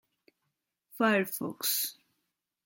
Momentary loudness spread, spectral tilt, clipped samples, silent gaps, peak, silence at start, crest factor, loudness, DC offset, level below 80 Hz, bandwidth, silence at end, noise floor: 8 LU; -3 dB/octave; under 0.1%; none; -12 dBFS; 0.95 s; 22 dB; -30 LUFS; under 0.1%; -82 dBFS; 17 kHz; 0.7 s; -83 dBFS